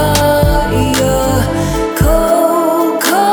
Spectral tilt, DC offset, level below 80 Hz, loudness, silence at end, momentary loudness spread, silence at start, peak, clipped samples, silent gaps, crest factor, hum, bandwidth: -5 dB/octave; under 0.1%; -20 dBFS; -12 LUFS; 0 s; 3 LU; 0 s; 0 dBFS; under 0.1%; none; 10 dB; none; over 20 kHz